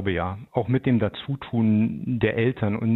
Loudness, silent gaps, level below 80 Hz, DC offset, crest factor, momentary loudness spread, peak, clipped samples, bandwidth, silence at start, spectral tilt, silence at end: -24 LUFS; none; -52 dBFS; under 0.1%; 16 dB; 7 LU; -8 dBFS; under 0.1%; 4.2 kHz; 0 s; -10 dB/octave; 0 s